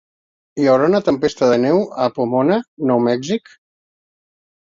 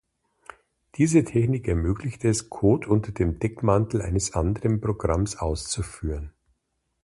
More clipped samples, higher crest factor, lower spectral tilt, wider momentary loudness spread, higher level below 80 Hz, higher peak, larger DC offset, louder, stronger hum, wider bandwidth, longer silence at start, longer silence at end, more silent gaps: neither; about the same, 16 dB vs 18 dB; about the same, -6.5 dB/octave vs -6.5 dB/octave; second, 7 LU vs 10 LU; second, -58 dBFS vs -36 dBFS; first, -2 dBFS vs -6 dBFS; neither; first, -17 LUFS vs -25 LUFS; neither; second, 7.6 kHz vs 11.5 kHz; second, 0.55 s vs 1 s; first, 1.4 s vs 0.75 s; first, 2.68-2.77 s vs none